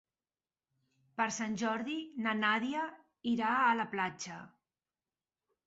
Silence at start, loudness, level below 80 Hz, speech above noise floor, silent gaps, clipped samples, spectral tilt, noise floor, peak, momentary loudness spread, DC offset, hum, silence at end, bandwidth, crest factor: 1.2 s; -34 LUFS; -78 dBFS; over 56 dB; none; under 0.1%; -2.5 dB/octave; under -90 dBFS; -18 dBFS; 14 LU; under 0.1%; none; 1.2 s; 8 kHz; 18 dB